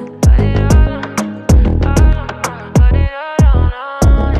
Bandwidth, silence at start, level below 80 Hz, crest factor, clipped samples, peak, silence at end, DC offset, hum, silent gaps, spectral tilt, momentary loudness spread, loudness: 13 kHz; 0 s; -12 dBFS; 10 dB; under 0.1%; 0 dBFS; 0 s; under 0.1%; none; none; -7 dB/octave; 8 LU; -13 LUFS